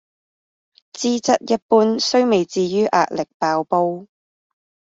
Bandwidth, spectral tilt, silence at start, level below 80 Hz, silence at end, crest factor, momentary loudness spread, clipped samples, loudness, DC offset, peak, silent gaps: 8 kHz; -4.5 dB/octave; 0.95 s; -64 dBFS; 0.9 s; 18 dB; 7 LU; under 0.1%; -18 LUFS; under 0.1%; -2 dBFS; 1.62-1.69 s, 3.34-3.40 s